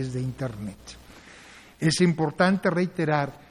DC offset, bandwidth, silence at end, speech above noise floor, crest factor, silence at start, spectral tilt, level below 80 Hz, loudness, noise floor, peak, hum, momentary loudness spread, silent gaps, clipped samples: under 0.1%; 12 kHz; 0.15 s; 24 dB; 20 dB; 0 s; -5.5 dB/octave; -54 dBFS; -25 LUFS; -49 dBFS; -6 dBFS; none; 22 LU; none; under 0.1%